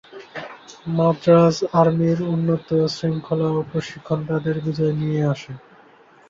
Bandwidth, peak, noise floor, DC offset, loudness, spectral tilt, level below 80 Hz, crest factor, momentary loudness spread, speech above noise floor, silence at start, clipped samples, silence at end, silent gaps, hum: 7.6 kHz; -4 dBFS; -50 dBFS; under 0.1%; -20 LUFS; -7.5 dB/octave; -56 dBFS; 18 dB; 20 LU; 31 dB; 0.1 s; under 0.1%; 0.7 s; none; none